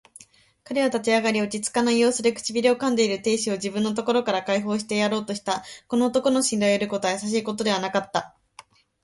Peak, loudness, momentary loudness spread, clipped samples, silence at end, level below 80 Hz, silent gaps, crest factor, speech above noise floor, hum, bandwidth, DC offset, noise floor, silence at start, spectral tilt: -6 dBFS; -23 LUFS; 7 LU; under 0.1%; 0.75 s; -64 dBFS; none; 18 dB; 30 dB; none; 11.5 kHz; under 0.1%; -53 dBFS; 0.7 s; -3.5 dB/octave